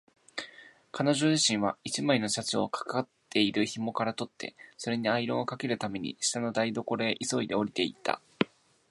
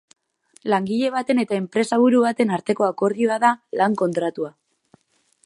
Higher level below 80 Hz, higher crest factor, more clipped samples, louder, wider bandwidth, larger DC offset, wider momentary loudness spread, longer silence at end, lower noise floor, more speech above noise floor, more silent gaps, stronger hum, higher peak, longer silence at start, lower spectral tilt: about the same, -70 dBFS vs -72 dBFS; about the same, 22 dB vs 18 dB; neither; second, -30 LUFS vs -21 LUFS; about the same, 11.5 kHz vs 11.5 kHz; neither; first, 13 LU vs 8 LU; second, 0.45 s vs 0.95 s; second, -53 dBFS vs -63 dBFS; second, 23 dB vs 43 dB; neither; neither; second, -8 dBFS vs -2 dBFS; second, 0.35 s vs 0.65 s; second, -3.5 dB/octave vs -6 dB/octave